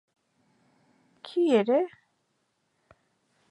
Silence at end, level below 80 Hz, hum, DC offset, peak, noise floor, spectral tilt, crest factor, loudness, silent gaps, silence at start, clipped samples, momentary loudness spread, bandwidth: 1.65 s; -82 dBFS; none; under 0.1%; -10 dBFS; -75 dBFS; -6.5 dB/octave; 20 dB; -26 LUFS; none; 1.25 s; under 0.1%; 14 LU; 11 kHz